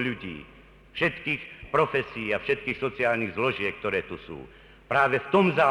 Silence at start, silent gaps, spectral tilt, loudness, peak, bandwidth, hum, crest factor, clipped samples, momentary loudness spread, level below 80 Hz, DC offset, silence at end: 0 s; none; -6.5 dB/octave; -26 LUFS; -10 dBFS; 11 kHz; none; 18 dB; under 0.1%; 17 LU; -56 dBFS; under 0.1%; 0 s